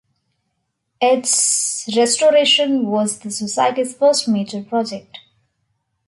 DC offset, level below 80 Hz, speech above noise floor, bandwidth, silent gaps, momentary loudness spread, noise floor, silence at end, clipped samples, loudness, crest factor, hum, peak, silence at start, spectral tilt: under 0.1%; -68 dBFS; 56 dB; 11.5 kHz; none; 9 LU; -72 dBFS; 0.9 s; under 0.1%; -16 LUFS; 16 dB; none; -4 dBFS; 1 s; -2 dB/octave